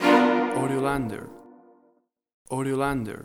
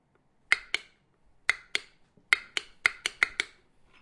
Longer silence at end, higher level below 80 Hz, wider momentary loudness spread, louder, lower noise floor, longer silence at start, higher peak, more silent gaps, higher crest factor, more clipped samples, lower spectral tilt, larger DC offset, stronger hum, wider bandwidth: second, 0 s vs 0.55 s; first, -52 dBFS vs -66 dBFS; first, 15 LU vs 8 LU; first, -25 LUFS vs -29 LUFS; about the same, -66 dBFS vs -67 dBFS; second, 0 s vs 0.5 s; second, -6 dBFS vs -2 dBFS; first, 2.34-2.45 s vs none; second, 20 dB vs 30 dB; neither; first, -6 dB/octave vs 1 dB/octave; neither; neither; first, 17 kHz vs 11.5 kHz